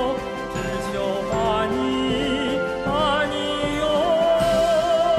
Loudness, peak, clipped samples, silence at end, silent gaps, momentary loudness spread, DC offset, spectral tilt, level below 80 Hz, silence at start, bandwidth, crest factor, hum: -22 LUFS; -10 dBFS; under 0.1%; 0 s; none; 7 LU; under 0.1%; -5 dB/octave; -42 dBFS; 0 s; 14 kHz; 12 dB; none